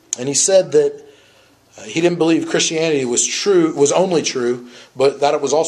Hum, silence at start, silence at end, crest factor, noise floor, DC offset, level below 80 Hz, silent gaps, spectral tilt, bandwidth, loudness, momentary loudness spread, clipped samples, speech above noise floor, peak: none; 0.1 s; 0 s; 16 dB; -51 dBFS; under 0.1%; -64 dBFS; none; -3 dB/octave; 12 kHz; -16 LUFS; 7 LU; under 0.1%; 35 dB; -2 dBFS